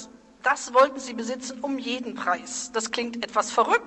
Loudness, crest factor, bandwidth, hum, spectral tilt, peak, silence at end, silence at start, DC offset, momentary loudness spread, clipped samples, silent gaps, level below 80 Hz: -26 LUFS; 18 dB; 10 kHz; none; -1.5 dB/octave; -8 dBFS; 0 s; 0 s; under 0.1%; 11 LU; under 0.1%; none; -66 dBFS